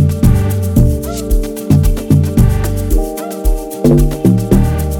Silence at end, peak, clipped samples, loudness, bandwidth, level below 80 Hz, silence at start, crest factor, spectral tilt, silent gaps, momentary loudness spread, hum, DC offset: 0 s; 0 dBFS; under 0.1%; -13 LUFS; 17.5 kHz; -16 dBFS; 0 s; 12 dB; -7.5 dB/octave; none; 8 LU; none; under 0.1%